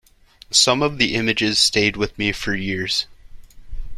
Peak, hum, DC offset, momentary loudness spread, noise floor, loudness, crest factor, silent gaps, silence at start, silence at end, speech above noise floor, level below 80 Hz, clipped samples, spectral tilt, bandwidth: -2 dBFS; none; under 0.1%; 8 LU; -49 dBFS; -18 LUFS; 20 dB; none; 0.5 s; 0 s; 29 dB; -38 dBFS; under 0.1%; -2.5 dB/octave; 14.5 kHz